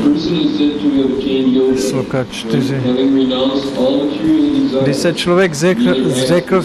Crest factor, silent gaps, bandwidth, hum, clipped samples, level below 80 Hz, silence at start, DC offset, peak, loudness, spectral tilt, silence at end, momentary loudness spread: 14 dB; none; 13 kHz; none; under 0.1%; -44 dBFS; 0 s; under 0.1%; 0 dBFS; -14 LUFS; -5.5 dB/octave; 0 s; 3 LU